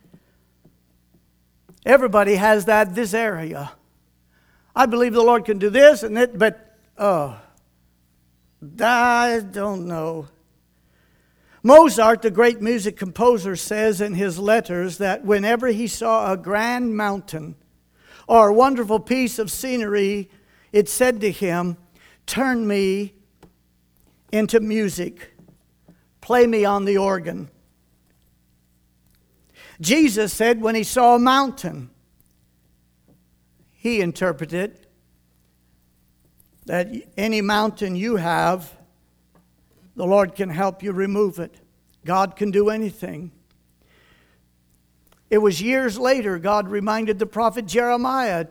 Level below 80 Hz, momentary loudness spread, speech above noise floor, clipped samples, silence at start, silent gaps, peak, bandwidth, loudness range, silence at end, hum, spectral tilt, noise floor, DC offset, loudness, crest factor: -54 dBFS; 14 LU; 43 dB; under 0.1%; 1.85 s; none; 0 dBFS; 20 kHz; 9 LU; 0.05 s; 60 Hz at -50 dBFS; -4.5 dB/octave; -61 dBFS; under 0.1%; -19 LUFS; 20 dB